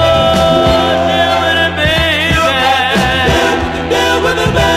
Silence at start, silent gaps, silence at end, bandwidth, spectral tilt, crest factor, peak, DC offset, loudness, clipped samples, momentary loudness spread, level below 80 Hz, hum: 0 s; none; 0 s; 15.5 kHz; -4.5 dB/octave; 10 dB; 0 dBFS; under 0.1%; -11 LUFS; under 0.1%; 2 LU; -26 dBFS; none